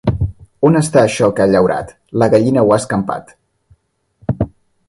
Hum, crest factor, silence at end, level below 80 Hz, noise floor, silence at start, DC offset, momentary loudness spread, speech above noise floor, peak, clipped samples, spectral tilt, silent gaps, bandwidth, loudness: none; 16 dB; 0.4 s; -36 dBFS; -58 dBFS; 0.05 s; under 0.1%; 12 LU; 45 dB; 0 dBFS; under 0.1%; -6.5 dB/octave; none; 11.5 kHz; -15 LUFS